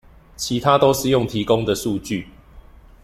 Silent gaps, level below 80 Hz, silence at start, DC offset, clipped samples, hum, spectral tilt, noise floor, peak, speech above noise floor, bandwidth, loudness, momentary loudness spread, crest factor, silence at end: none; -44 dBFS; 0.4 s; under 0.1%; under 0.1%; none; -5 dB/octave; -44 dBFS; -2 dBFS; 25 dB; 16 kHz; -19 LUFS; 13 LU; 20 dB; 0.45 s